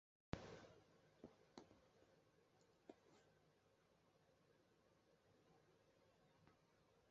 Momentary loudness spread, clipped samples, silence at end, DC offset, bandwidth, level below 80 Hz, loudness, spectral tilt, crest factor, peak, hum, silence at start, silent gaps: 13 LU; under 0.1%; 0 s; under 0.1%; 7.4 kHz; -78 dBFS; -61 LUFS; -5.5 dB/octave; 38 dB; -28 dBFS; none; 0.3 s; none